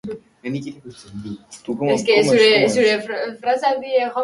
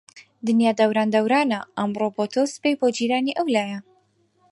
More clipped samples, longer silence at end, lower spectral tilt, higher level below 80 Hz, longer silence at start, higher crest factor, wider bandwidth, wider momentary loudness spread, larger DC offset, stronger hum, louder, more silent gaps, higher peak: neither; second, 0 s vs 0.7 s; about the same, -4 dB/octave vs -5 dB/octave; first, -60 dBFS vs -72 dBFS; about the same, 0.05 s vs 0.15 s; about the same, 18 dB vs 16 dB; about the same, 11.5 kHz vs 11.5 kHz; first, 21 LU vs 7 LU; neither; neither; first, -17 LUFS vs -22 LUFS; neither; first, -2 dBFS vs -6 dBFS